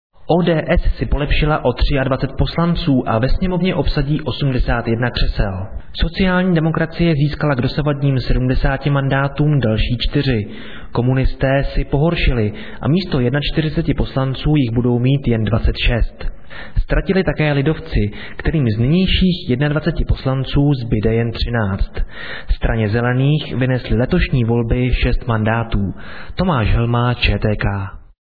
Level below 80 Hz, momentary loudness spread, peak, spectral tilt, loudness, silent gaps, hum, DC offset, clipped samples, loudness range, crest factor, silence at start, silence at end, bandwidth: -22 dBFS; 7 LU; -2 dBFS; -9.5 dB/octave; -18 LUFS; none; none; 2%; under 0.1%; 2 LU; 14 dB; 0.1 s; 0.05 s; 5 kHz